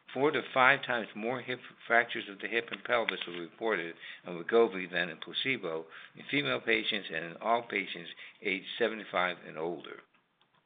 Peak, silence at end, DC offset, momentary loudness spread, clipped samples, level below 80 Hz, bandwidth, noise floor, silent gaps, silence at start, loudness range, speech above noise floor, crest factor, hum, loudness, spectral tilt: -8 dBFS; 0.65 s; under 0.1%; 14 LU; under 0.1%; -78 dBFS; 4.6 kHz; -70 dBFS; none; 0.1 s; 3 LU; 37 dB; 26 dB; none; -32 LUFS; -1.5 dB/octave